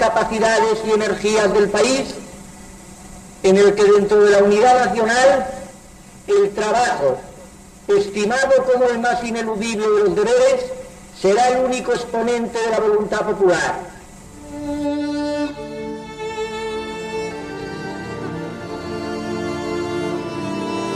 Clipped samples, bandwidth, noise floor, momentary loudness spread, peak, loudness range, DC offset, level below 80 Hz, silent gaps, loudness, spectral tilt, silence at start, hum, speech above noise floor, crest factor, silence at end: under 0.1%; 12.5 kHz; -41 dBFS; 18 LU; -4 dBFS; 11 LU; under 0.1%; -46 dBFS; none; -18 LUFS; -4.5 dB/octave; 0 s; none; 25 dB; 14 dB; 0 s